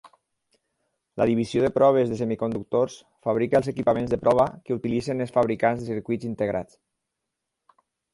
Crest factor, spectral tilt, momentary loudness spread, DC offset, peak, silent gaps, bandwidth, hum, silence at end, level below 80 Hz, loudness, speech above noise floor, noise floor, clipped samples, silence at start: 18 dB; -7.5 dB/octave; 10 LU; under 0.1%; -8 dBFS; none; 11.5 kHz; none; 1.5 s; -56 dBFS; -24 LUFS; 59 dB; -83 dBFS; under 0.1%; 0.05 s